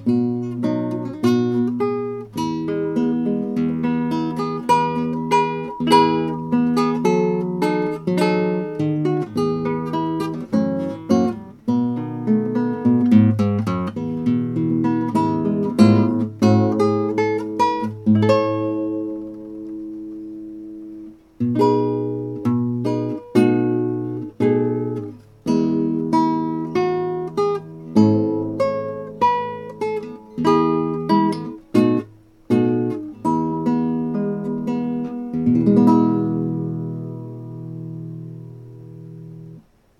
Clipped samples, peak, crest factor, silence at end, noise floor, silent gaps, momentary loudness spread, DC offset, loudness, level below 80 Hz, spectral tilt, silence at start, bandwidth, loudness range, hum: under 0.1%; 0 dBFS; 20 dB; 0.4 s; -45 dBFS; none; 16 LU; under 0.1%; -20 LUFS; -56 dBFS; -8 dB/octave; 0 s; 12 kHz; 4 LU; none